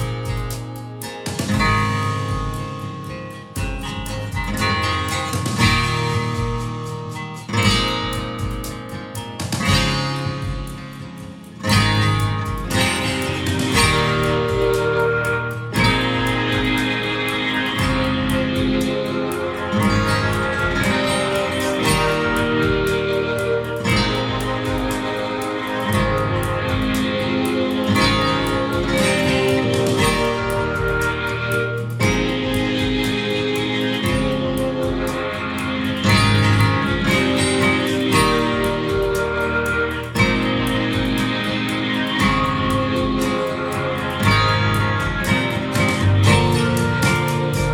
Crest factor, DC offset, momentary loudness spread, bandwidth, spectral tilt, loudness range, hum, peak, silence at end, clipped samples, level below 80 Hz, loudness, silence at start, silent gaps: 18 dB; under 0.1%; 10 LU; 17.5 kHz; -5 dB/octave; 5 LU; none; -2 dBFS; 0 s; under 0.1%; -34 dBFS; -19 LUFS; 0 s; none